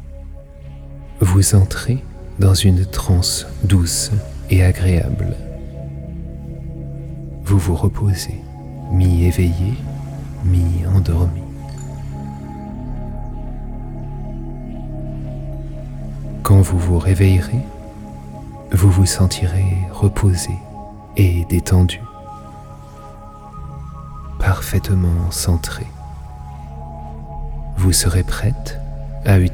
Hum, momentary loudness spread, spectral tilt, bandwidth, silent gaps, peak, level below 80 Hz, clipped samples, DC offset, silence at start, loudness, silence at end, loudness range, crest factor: none; 20 LU; -5.5 dB/octave; 17 kHz; none; -2 dBFS; -28 dBFS; under 0.1%; under 0.1%; 0 s; -17 LUFS; 0 s; 8 LU; 16 dB